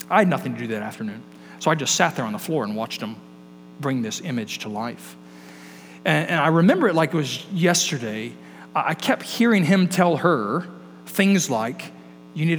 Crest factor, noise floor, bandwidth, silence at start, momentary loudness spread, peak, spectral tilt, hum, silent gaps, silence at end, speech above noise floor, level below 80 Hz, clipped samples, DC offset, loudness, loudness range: 22 dB; -44 dBFS; over 20 kHz; 0 s; 20 LU; -2 dBFS; -4.5 dB/octave; none; none; 0 s; 23 dB; -74 dBFS; under 0.1%; under 0.1%; -22 LUFS; 8 LU